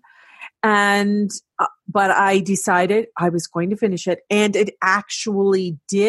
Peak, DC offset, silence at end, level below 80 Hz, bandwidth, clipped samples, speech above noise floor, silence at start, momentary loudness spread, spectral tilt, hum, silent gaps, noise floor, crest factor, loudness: -2 dBFS; under 0.1%; 0 s; -66 dBFS; 12.5 kHz; under 0.1%; 24 dB; 0.4 s; 8 LU; -4.5 dB/octave; none; none; -42 dBFS; 16 dB; -19 LUFS